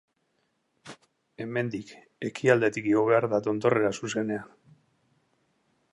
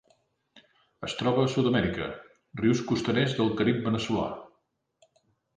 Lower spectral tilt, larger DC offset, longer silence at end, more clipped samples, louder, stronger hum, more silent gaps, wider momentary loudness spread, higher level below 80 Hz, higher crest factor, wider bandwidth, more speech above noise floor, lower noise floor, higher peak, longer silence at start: about the same, -6 dB/octave vs -6 dB/octave; neither; first, 1.5 s vs 1.1 s; neither; about the same, -26 LUFS vs -27 LUFS; neither; neither; first, 21 LU vs 13 LU; second, -70 dBFS vs -56 dBFS; about the same, 22 dB vs 18 dB; first, 11.5 kHz vs 9.6 kHz; about the same, 48 dB vs 47 dB; about the same, -74 dBFS vs -74 dBFS; first, -6 dBFS vs -10 dBFS; second, 0.85 s vs 1 s